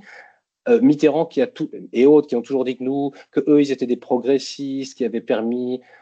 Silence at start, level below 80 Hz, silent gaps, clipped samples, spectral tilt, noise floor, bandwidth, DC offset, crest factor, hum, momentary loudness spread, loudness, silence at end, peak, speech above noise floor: 0.1 s; -72 dBFS; none; under 0.1%; -6.5 dB/octave; -49 dBFS; 8.2 kHz; under 0.1%; 16 dB; none; 12 LU; -19 LUFS; 0.25 s; -4 dBFS; 30 dB